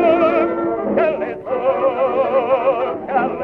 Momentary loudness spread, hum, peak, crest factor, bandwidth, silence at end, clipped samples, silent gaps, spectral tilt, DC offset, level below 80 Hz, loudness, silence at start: 5 LU; none; -2 dBFS; 14 dB; 5 kHz; 0 s; under 0.1%; none; -8.5 dB/octave; under 0.1%; -54 dBFS; -18 LUFS; 0 s